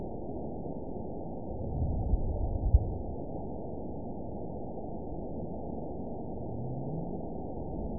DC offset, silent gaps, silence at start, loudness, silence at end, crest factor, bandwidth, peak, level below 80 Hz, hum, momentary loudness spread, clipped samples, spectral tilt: 0.8%; none; 0 s; -37 LUFS; 0 s; 24 dB; 1 kHz; -10 dBFS; -38 dBFS; none; 8 LU; under 0.1%; -16.5 dB/octave